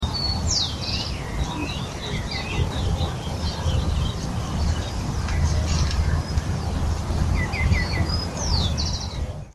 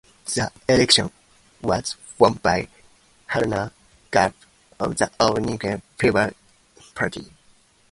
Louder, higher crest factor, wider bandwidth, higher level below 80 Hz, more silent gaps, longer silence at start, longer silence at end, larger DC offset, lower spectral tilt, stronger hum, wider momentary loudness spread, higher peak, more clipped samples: second, -25 LUFS vs -22 LUFS; second, 16 dB vs 22 dB; about the same, 12.5 kHz vs 11.5 kHz; first, -28 dBFS vs -48 dBFS; neither; second, 0 s vs 0.25 s; second, 0 s vs 0.65 s; neither; about the same, -4.5 dB/octave vs -4 dB/octave; neither; second, 6 LU vs 13 LU; second, -8 dBFS vs 0 dBFS; neither